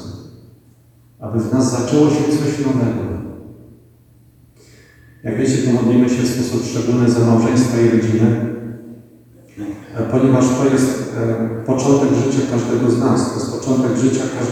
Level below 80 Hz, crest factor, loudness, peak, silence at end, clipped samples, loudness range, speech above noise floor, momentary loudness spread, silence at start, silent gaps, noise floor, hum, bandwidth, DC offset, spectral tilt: -52 dBFS; 16 dB; -16 LUFS; 0 dBFS; 0 s; under 0.1%; 5 LU; 34 dB; 15 LU; 0 s; none; -49 dBFS; none; 13.5 kHz; under 0.1%; -6.5 dB/octave